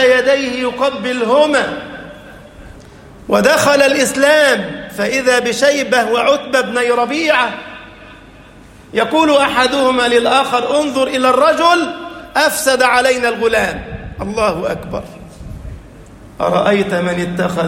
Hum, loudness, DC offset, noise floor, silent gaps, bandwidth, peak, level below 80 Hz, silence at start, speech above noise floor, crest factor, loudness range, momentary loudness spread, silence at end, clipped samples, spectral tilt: none; -13 LUFS; under 0.1%; -39 dBFS; none; 16.5 kHz; 0 dBFS; -42 dBFS; 0 s; 26 dB; 14 dB; 6 LU; 17 LU; 0 s; under 0.1%; -3.5 dB/octave